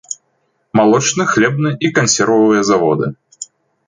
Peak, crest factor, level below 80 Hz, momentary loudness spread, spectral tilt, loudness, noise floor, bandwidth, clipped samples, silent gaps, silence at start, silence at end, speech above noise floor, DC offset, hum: -2 dBFS; 14 dB; -54 dBFS; 19 LU; -4.5 dB/octave; -13 LUFS; -64 dBFS; 9.6 kHz; under 0.1%; none; 0.1 s; 0.45 s; 51 dB; under 0.1%; none